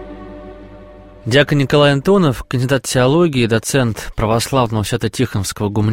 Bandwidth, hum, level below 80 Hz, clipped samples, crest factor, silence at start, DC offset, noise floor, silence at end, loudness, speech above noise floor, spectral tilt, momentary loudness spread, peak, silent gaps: 16.5 kHz; none; -38 dBFS; under 0.1%; 16 dB; 0 s; 0.4%; -38 dBFS; 0 s; -15 LUFS; 23 dB; -5.5 dB/octave; 17 LU; 0 dBFS; none